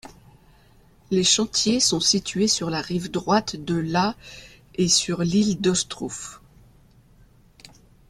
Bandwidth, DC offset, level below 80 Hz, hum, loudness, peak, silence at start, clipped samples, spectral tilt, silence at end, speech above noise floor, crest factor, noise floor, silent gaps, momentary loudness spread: 14.5 kHz; under 0.1%; -54 dBFS; none; -22 LUFS; -6 dBFS; 0.05 s; under 0.1%; -3.5 dB/octave; 1.75 s; 32 dB; 18 dB; -54 dBFS; none; 16 LU